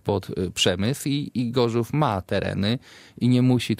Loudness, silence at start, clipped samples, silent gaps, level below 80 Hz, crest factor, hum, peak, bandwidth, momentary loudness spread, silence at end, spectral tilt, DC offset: -24 LUFS; 0.05 s; under 0.1%; none; -56 dBFS; 18 dB; none; -6 dBFS; 15.5 kHz; 6 LU; 0.05 s; -5.5 dB/octave; under 0.1%